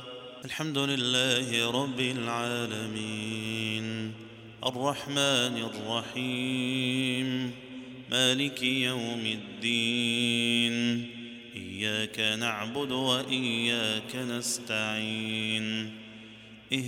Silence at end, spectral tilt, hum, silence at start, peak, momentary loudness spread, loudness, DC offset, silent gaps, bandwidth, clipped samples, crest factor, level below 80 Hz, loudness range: 0 s; -3.5 dB/octave; none; 0 s; -10 dBFS; 15 LU; -29 LUFS; under 0.1%; none; 16.5 kHz; under 0.1%; 20 dB; -72 dBFS; 3 LU